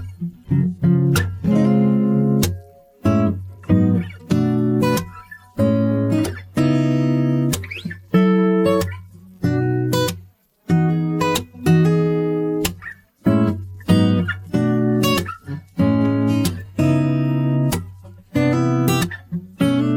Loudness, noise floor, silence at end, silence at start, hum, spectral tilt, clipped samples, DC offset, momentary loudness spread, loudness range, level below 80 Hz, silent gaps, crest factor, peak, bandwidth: -19 LUFS; -47 dBFS; 0 s; 0 s; none; -7 dB/octave; under 0.1%; under 0.1%; 12 LU; 2 LU; -46 dBFS; none; 16 dB; -2 dBFS; 17 kHz